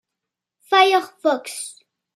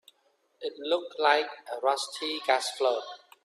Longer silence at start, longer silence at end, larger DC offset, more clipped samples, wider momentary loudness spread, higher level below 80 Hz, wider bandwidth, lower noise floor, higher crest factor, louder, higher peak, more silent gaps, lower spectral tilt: about the same, 0.7 s vs 0.6 s; first, 0.45 s vs 0.25 s; neither; neither; first, 16 LU vs 13 LU; about the same, -84 dBFS vs -82 dBFS; about the same, 15 kHz vs 14.5 kHz; first, -84 dBFS vs -70 dBFS; about the same, 20 dB vs 20 dB; first, -18 LUFS vs -28 LUFS; first, -2 dBFS vs -10 dBFS; neither; about the same, -0.5 dB/octave vs 0 dB/octave